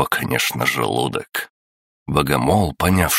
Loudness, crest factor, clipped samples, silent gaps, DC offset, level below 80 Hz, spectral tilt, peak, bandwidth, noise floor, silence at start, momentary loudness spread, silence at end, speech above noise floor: -19 LUFS; 18 dB; under 0.1%; 1.50-2.06 s; under 0.1%; -38 dBFS; -4.5 dB/octave; -2 dBFS; 16.5 kHz; under -90 dBFS; 0 s; 10 LU; 0 s; over 71 dB